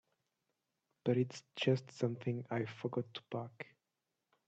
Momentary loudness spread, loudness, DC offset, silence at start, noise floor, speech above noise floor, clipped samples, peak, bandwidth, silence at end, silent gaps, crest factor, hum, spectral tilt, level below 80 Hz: 10 LU; -39 LUFS; under 0.1%; 1.05 s; -88 dBFS; 50 dB; under 0.1%; -18 dBFS; 8.2 kHz; 0.85 s; none; 22 dB; none; -7 dB/octave; -80 dBFS